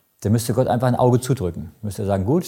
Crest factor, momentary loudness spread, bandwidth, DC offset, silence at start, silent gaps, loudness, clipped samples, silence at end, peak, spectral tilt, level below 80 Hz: 16 dB; 10 LU; 17 kHz; under 0.1%; 0.2 s; none; -20 LUFS; under 0.1%; 0 s; -4 dBFS; -7 dB/octave; -48 dBFS